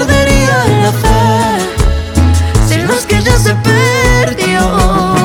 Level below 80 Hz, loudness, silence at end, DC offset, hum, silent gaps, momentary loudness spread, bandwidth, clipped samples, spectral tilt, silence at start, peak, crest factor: -18 dBFS; -10 LUFS; 0 s; under 0.1%; none; none; 3 LU; 17.5 kHz; 0.1%; -5 dB/octave; 0 s; 0 dBFS; 10 dB